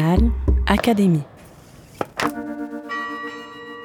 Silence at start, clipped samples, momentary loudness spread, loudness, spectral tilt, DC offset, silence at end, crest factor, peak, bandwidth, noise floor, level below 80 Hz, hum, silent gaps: 0 s; under 0.1%; 15 LU; -22 LUFS; -6.5 dB/octave; under 0.1%; 0 s; 18 dB; -4 dBFS; 16 kHz; -45 dBFS; -26 dBFS; none; none